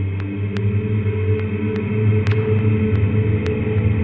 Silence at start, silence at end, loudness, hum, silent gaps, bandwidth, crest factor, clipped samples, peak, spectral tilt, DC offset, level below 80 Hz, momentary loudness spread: 0 s; 0 s; -19 LUFS; none; none; 4.9 kHz; 12 dB; under 0.1%; -6 dBFS; -10 dB/octave; under 0.1%; -42 dBFS; 4 LU